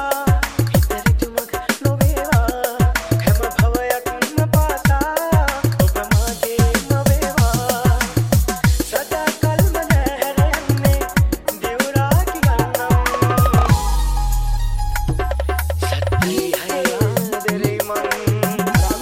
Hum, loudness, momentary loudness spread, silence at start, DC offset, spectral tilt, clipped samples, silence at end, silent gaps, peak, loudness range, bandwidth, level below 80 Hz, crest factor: none; -18 LUFS; 5 LU; 0 s; under 0.1%; -5.5 dB/octave; under 0.1%; 0 s; none; 0 dBFS; 2 LU; 17 kHz; -22 dBFS; 16 dB